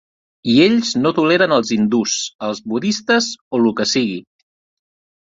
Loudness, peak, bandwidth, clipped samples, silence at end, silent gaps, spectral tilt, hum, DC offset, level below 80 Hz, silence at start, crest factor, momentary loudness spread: -17 LUFS; -2 dBFS; 7.8 kHz; under 0.1%; 1.1 s; 2.35-2.39 s, 3.41-3.51 s; -4 dB/octave; none; under 0.1%; -58 dBFS; 0.45 s; 16 dB; 10 LU